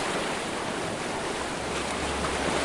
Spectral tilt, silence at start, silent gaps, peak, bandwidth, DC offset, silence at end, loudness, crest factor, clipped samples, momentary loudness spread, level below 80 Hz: -3.5 dB/octave; 0 s; none; -14 dBFS; 11.5 kHz; under 0.1%; 0 s; -30 LUFS; 16 dB; under 0.1%; 3 LU; -46 dBFS